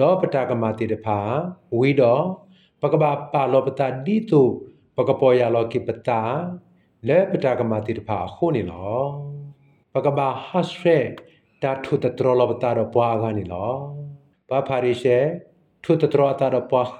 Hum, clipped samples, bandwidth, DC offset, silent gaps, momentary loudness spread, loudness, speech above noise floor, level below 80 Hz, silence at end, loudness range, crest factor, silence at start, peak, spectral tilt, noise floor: none; under 0.1%; 9.2 kHz; under 0.1%; none; 12 LU; -21 LUFS; 26 dB; -62 dBFS; 0 s; 4 LU; 18 dB; 0 s; -4 dBFS; -8.5 dB/octave; -46 dBFS